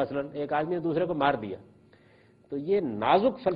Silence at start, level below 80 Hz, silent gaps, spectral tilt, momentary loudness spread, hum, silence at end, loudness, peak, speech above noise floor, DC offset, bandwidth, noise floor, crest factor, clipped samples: 0 s; -62 dBFS; none; -9.5 dB/octave; 14 LU; none; 0 s; -28 LUFS; -10 dBFS; 32 dB; under 0.1%; 5.2 kHz; -59 dBFS; 20 dB; under 0.1%